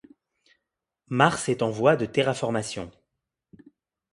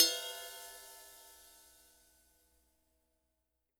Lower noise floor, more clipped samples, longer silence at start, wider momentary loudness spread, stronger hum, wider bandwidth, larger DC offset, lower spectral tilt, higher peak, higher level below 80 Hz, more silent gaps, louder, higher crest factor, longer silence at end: about the same, -84 dBFS vs -85 dBFS; neither; first, 1.1 s vs 0 s; second, 13 LU vs 21 LU; second, none vs 60 Hz at -80 dBFS; second, 11.5 kHz vs over 20 kHz; neither; first, -5 dB/octave vs 2 dB/octave; first, -2 dBFS vs -10 dBFS; first, -62 dBFS vs -80 dBFS; neither; first, -24 LUFS vs -37 LUFS; second, 24 dB vs 32 dB; second, 1.25 s vs 2.45 s